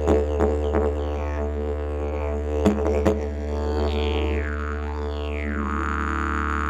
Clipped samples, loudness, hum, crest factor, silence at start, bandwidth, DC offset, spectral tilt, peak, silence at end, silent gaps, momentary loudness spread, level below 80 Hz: under 0.1%; -25 LUFS; none; 20 dB; 0 s; 8 kHz; under 0.1%; -7.5 dB/octave; -4 dBFS; 0 s; none; 7 LU; -28 dBFS